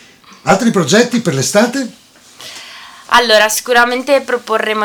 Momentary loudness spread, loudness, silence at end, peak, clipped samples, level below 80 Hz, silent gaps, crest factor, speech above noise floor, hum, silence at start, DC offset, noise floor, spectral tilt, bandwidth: 20 LU; -12 LUFS; 0 s; 0 dBFS; under 0.1%; -52 dBFS; none; 14 dB; 24 dB; none; 0.45 s; under 0.1%; -36 dBFS; -3.5 dB/octave; over 20 kHz